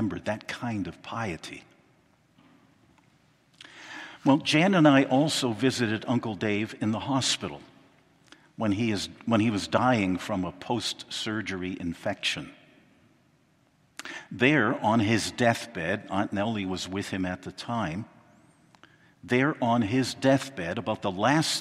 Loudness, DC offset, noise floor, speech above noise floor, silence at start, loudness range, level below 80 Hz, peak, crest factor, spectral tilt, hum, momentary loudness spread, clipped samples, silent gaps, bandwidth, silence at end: -27 LUFS; under 0.1%; -65 dBFS; 38 dB; 0 s; 10 LU; -66 dBFS; -4 dBFS; 24 dB; -5 dB/octave; none; 15 LU; under 0.1%; none; 14.5 kHz; 0 s